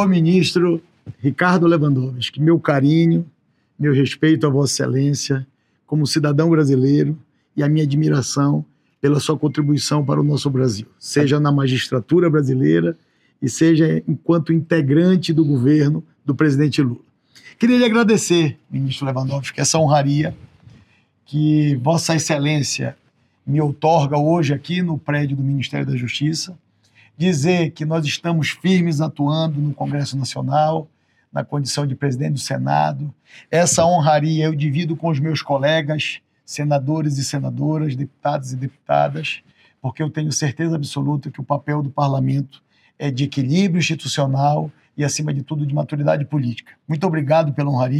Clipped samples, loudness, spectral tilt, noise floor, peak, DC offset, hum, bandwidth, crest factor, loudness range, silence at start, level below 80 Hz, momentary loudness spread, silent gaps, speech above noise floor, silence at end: under 0.1%; -18 LUFS; -6 dB/octave; -55 dBFS; 0 dBFS; under 0.1%; none; 13 kHz; 18 dB; 5 LU; 0 s; -62 dBFS; 10 LU; none; 38 dB; 0 s